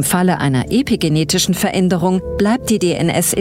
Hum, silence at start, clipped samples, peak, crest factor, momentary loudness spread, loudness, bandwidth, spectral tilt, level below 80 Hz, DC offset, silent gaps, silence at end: none; 0 s; under 0.1%; -2 dBFS; 14 dB; 2 LU; -15 LUFS; 16.5 kHz; -4.5 dB/octave; -38 dBFS; under 0.1%; none; 0 s